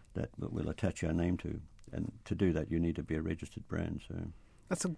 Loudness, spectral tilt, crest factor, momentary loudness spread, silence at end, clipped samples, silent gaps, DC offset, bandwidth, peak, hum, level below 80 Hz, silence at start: -37 LUFS; -6.5 dB/octave; 18 dB; 11 LU; 0 s; under 0.1%; none; under 0.1%; 11 kHz; -18 dBFS; none; -50 dBFS; 0 s